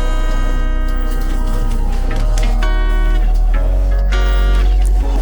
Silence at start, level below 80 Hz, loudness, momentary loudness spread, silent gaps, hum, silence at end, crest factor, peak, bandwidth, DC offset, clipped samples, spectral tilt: 0 s; -12 dBFS; -18 LUFS; 5 LU; none; none; 0 s; 8 dB; -4 dBFS; over 20 kHz; under 0.1%; under 0.1%; -6 dB/octave